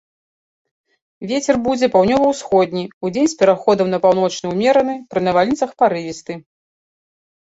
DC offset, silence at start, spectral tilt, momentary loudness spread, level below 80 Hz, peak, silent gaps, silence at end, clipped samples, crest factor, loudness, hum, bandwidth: under 0.1%; 1.2 s; -5 dB/octave; 10 LU; -54 dBFS; -2 dBFS; 2.93-3.01 s; 1.15 s; under 0.1%; 16 dB; -17 LUFS; none; 8 kHz